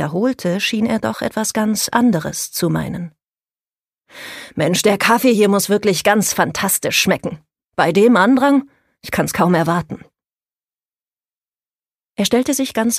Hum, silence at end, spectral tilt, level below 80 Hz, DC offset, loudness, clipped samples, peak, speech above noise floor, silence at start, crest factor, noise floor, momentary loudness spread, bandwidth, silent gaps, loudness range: none; 0 s; -4 dB/octave; -52 dBFS; under 0.1%; -16 LUFS; under 0.1%; 0 dBFS; over 74 dB; 0 s; 18 dB; under -90 dBFS; 16 LU; 15.5 kHz; none; 7 LU